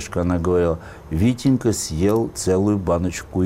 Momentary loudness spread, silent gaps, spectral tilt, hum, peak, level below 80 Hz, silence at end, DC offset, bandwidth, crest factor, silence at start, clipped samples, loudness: 4 LU; none; -6 dB/octave; none; -8 dBFS; -38 dBFS; 0 s; 0.1%; 16 kHz; 12 dB; 0 s; under 0.1%; -20 LUFS